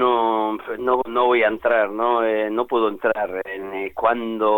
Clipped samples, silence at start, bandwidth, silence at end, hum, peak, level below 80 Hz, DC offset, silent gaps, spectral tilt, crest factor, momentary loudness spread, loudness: under 0.1%; 0 s; 17.5 kHz; 0 s; none; -6 dBFS; -58 dBFS; under 0.1%; none; -6.5 dB/octave; 14 dB; 8 LU; -21 LUFS